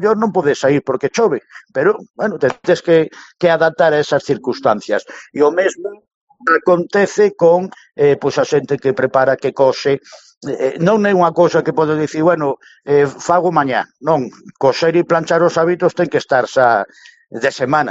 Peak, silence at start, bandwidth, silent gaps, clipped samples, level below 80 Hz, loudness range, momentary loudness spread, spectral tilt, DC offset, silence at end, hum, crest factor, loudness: 0 dBFS; 0 s; 8 kHz; 6.14-6.27 s, 10.37-10.41 s; under 0.1%; -60 dBFS; 2 LU; 9 LU; -6 dB/octave; under 0.1%; 0 s; none; 14 dB; -15 LUFS